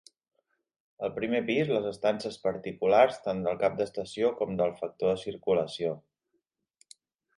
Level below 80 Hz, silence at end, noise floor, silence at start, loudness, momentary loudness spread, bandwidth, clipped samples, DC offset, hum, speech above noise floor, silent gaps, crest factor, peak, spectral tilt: -66 dBFS; 1.4 s; -79 dBFS; 1 s; -29 LUFS; 9 LU; 11.5 kHz; under 0.1%; under 0.1%; none; 51 dB; none; 22 dB; -8 dBFS; -6 dB/octave